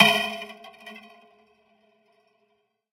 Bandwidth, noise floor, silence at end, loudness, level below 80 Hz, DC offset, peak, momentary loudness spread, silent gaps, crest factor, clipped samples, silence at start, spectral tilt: 16.5 kHz; -71 dBFS; 1.95 s; -23 LUFS; -70 dBFS; under 0.1%; -2 dBFS; 23 LU; none; 28 dB; under 0.1%; 0 s; -3 dB/octave